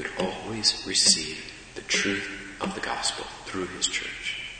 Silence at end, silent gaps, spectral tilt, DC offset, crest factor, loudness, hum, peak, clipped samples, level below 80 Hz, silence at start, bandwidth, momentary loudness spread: 0 s; none; -1 dB/octave; under 0.1%; 22 dB; -26 LUFS; none; -6 dBFS; under 0.1%; -54 dBFS; 0 s; 9.6 kHz; 16 LU